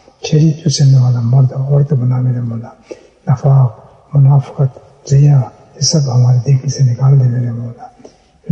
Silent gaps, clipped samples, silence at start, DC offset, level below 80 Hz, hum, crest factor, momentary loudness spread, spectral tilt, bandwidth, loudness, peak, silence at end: none; under 0.1%; 0.25 s; under 0.1%; -48 dBFS; none; 10 dB; 12 LU; -6.5 dB/octave; 8.2 kHz; -12 LUFS; -2 dBFS; 0 s